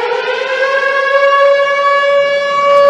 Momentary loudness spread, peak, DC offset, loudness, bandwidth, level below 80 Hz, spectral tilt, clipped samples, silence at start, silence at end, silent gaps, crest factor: 6 LU; 0 dBFS; under 0.1%; -11 LUFS; 8.8 kHz; -66 dBFS; -1.5 dB/octave; under 0.1%; 0 s; 0 s; none; 10 dB